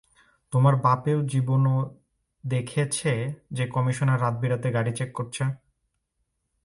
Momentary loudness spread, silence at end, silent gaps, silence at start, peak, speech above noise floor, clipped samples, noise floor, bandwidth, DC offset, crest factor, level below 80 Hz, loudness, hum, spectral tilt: 9 LU; 1.1 s; none; 0.5 s; -6 dBFS; 53 dB; under 0.1%; -77 dBFS; 11.5 kHz; under 0.1%; 20 dB; -60 dBFS; -25 LUFS; none; -6.5 dB/octave